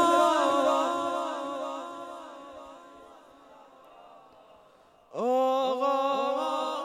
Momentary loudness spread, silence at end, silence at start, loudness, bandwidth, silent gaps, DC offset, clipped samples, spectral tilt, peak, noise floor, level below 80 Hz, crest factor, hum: 21 LU; 0 s; 0 s; -27 LUFS; 14.5 kHz; none; under 0.1%; under 0.1%; -3 dB/octave; -12 dBFS; -59 dBFS; -74 dBFS; 18 dB; none